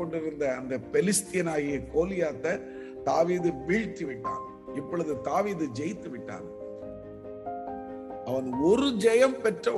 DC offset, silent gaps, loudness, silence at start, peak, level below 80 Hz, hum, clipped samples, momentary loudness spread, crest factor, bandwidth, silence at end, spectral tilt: under 0.1%; none; -29 LUFS; 0 s; -10 dBFS; -56 dBFS; none; under 0.1%; 16 LU; 20 dB; 13 kHz; 0 s; -5 dB/octave